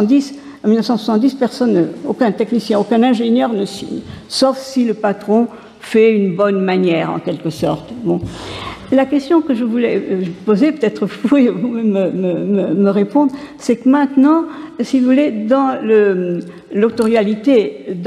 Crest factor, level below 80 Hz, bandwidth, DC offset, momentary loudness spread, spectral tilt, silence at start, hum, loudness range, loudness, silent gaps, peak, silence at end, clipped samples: 12 dB; -52 dBFS; 12.5 kHz; under 0.1%; 9 LU; -6.5 dB/octave; 0 s; none; 2 LU; -15 LUFS; none; -2 dBFS; 0 s; under 0.1%